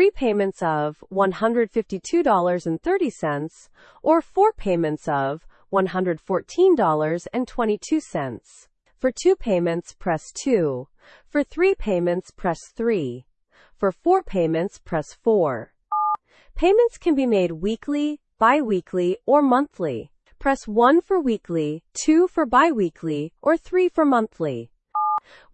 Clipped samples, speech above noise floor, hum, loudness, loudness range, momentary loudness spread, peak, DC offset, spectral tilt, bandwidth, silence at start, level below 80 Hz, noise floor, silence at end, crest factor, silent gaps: under 0.1%; 35 dB; none; -22 LUFS; 4 LU; 10 LU; -4 dBFS; under 0.1%; -6 dB/octave; 8.8 kHz; 0 s; -46 dBFS; -57 dBFS; 0.35 s; 16 dB; none